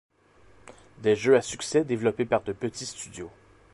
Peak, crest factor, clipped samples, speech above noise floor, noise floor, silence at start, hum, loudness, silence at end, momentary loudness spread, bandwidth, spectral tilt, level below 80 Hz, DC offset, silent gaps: -8 dBFS; 18 dB; under 0.1%; 32 dB; -58 dBFS; 1 s; none; -26 LUFS; 0.45 s; 17 LU; 11.5 kHz; -4.5 dB/octave; -60 dBFS; under 0.1%; none